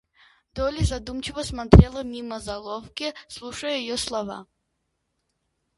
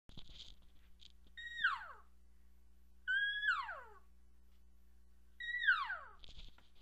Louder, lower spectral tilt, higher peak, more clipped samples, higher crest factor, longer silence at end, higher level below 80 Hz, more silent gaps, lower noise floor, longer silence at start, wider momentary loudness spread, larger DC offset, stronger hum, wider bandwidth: first, -24 LUFS vs -38 LUFS; first, -6 dB/octave vs -1.5 dB/octave; first, 0 dBFS vs -20 dBFS; neither; about the same, 24 dB vs 24 dB; first, 1.35 s vs 0 s; first, -30 dBFS vs -64 dBFS; neither; first, -76 dBFS vs -67 dBFS; first, 0.55 s vs 0.1 s; second, 20 LU vs 24 LU; neither; neither; about the same, 11.5 kHz vs 12.5 kHz